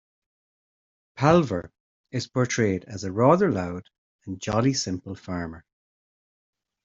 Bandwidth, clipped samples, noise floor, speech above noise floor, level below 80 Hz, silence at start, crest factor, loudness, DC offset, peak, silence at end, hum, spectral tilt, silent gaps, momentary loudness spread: 7.8 kHz; under 0.1%; under -90 dBFS; over 66 dB; -56 dBFS; 1.15 s; 24 dB; -25 LUFS; under 0.1%; -4 dBFS; 1.25 s; none; -6 dB/octave; 1.80-2.04 s, 3.98-4.19 s; 15 LU